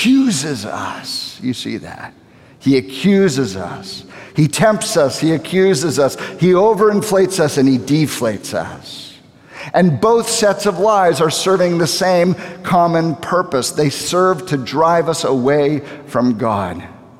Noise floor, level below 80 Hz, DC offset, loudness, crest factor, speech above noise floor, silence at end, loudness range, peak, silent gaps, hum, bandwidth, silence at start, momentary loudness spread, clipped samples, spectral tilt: -40 dBFS; -54 dBFS; under 0.1%; -15 LUFS; 14 dB; 25 dB; 0.25 s; 4 LU; -2 dBFS; none; none; 16 kHz; 0 s; 12 LU; under 0.1%; -5 dB/octave